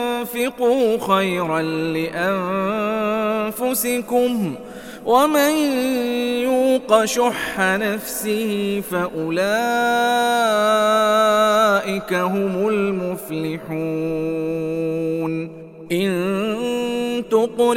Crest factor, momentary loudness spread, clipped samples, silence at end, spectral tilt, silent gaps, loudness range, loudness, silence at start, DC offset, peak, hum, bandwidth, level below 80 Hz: 18 dB; 8 LU; under 0.1%; 0 s; -4.5 dB/octave; none; 6 LU; -20 LUFS; 0 s; under 0.1%; -2 dBFS; none; 17 kHz; -54 dBFS